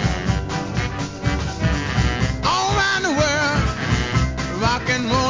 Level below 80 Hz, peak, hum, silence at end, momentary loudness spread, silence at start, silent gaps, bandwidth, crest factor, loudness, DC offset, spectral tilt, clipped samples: -28 dBFS; -4 dBFS; none; 0 s; 6 LU; 0 s; none; 7.6 kHz; 16 dB; -20 LUFS; 0.2%; -4.5 dB/octave; under 0.1%